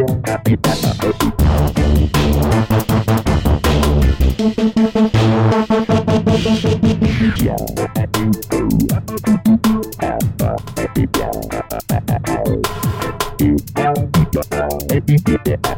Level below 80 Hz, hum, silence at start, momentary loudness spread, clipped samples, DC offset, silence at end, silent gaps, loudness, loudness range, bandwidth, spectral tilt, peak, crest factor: -24 dBFS; none; 0 s; 6 LU; under 0.1%; under 0.1%; 0 s; none; -16 LUFS; 4 LU; 17 kHz; -6.5 dB/octave; -4 dBFS; 12 dB